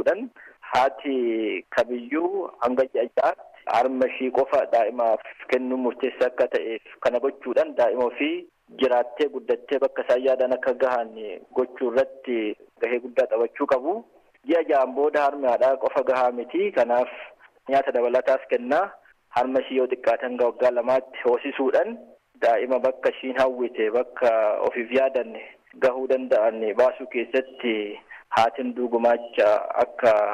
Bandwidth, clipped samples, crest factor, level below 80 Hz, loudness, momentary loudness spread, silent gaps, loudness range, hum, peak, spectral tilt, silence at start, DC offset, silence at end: 10 kHz; under 0.1%; 14 dB; -68 dBFS; -24 LUFS; 7 LU; none; 2 LU; none; -10 dBFS; -5 dB/octave; 0 s; under 0.1%; 0 s